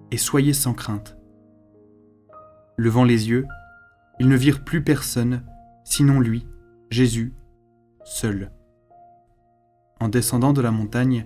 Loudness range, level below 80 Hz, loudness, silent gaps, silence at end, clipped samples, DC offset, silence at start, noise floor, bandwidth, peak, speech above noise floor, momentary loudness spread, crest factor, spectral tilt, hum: 7 LU; -44 dBFS; -21 LUFS; none; 0 s; under 0.1%; under 0.1%; 0.1 s; -61 dBFS; 16 kHz; -4 dBFS; 42 dB; 14 LU; 18 dB; -5.5 dB/octave; none